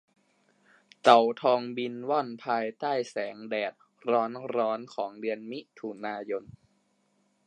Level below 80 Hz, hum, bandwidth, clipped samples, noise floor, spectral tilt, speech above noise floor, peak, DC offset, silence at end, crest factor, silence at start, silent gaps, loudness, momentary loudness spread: -78 dBFS; none; 10.5 kHz; under 0.1%; -71 dBFS; -5 dB/octave; 43 dB; -4 dBFS; under 0.1%; 1.05 s; 26 dB; 1.05 s; none; -29 LUFS; 16 LU